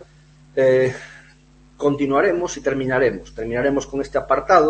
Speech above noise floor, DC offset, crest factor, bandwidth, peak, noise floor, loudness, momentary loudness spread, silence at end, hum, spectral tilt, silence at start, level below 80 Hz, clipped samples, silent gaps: 32 dB; under 0.1%; 20 dB; 8.6 kHz; 0 dBFS; -50 dBFS; -20 LUFS; 11 LU; 0 s; none; -5.5 dB/octave; 0 s; -46 dBFS; under 0.1%; none